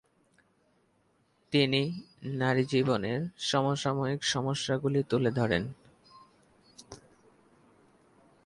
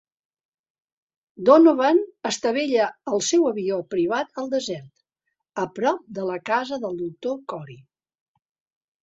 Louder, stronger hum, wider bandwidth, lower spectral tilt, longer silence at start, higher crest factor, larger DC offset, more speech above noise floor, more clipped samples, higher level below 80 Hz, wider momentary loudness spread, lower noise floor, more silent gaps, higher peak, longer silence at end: second, -29 LUFS vs -22 LUFS; neither; first, 11.5 kHz vs 8 kHz; about the same, -5 dB/octave vs -4 dB/octave; about the same, 1.5 s vs 1.4 s; about the same, 20 dB vs 22 dB; neither; second, 41 dB vs 58 dB; neither; first, -62 dBFS vs -70 dBFS; about the same, 14 LU vs 14 LU; second, -70 dBFS vs -80 dBFS; neither; second, -12 dBFS vs -2 dBFS; first, 1.5 s vs 1.25 s